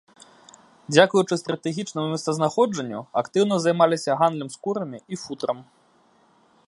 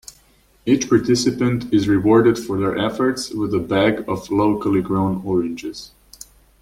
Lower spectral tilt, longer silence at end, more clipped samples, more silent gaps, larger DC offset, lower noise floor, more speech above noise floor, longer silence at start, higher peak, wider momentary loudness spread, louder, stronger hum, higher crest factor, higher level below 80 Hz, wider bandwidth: about the same, -5 dB/octave vs -6 dB/octave; first, 1.05 s vs 0.75 s; neither; neither; neither; first, -60 dBFS vs -55 dBFS; about the same, 37 dB vs 37 dB; first, 0.9 s vs 0.65 s; about the same, -2 dBFS vs -2 dBFS; about the same, 12 LU vs 10 LU; second, -23 LUFS vs -19 LUFS; neither; first, 22 dB vs 16 dB; second, -72 dBFS vs -48 dBFS; second, 11.5 kHz vs 15.5 kHz